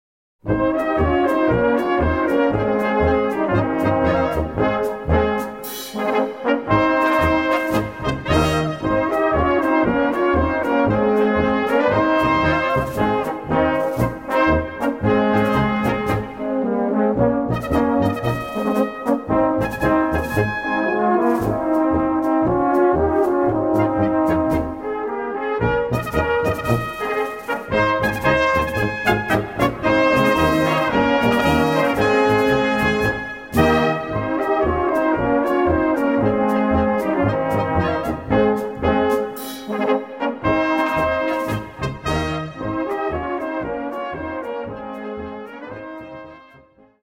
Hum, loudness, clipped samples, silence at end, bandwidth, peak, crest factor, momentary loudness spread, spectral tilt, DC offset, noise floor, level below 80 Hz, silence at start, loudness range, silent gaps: none; -19 LUFS; under 0.1%; 0.6 s; 16.5 kHz; -2 dBFS; 16 dB; 8 LU; -6.5 dB/octave; 0.1%; -50 dBFS; -36 dBFS; 0.45 s; 4 LU; none